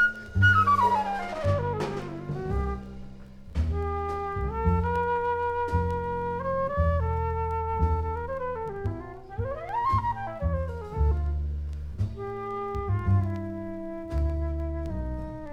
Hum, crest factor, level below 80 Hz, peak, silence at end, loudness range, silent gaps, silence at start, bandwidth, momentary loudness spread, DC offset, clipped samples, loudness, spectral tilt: none; 18 dB; -34 dBFS; -8 dBFS; 0 s; 3 LU; none; 0 s; 8.4 kHz; 10 LU; under 0.1%; under 0.1%; -28 LUFS; -7.5 dB/octave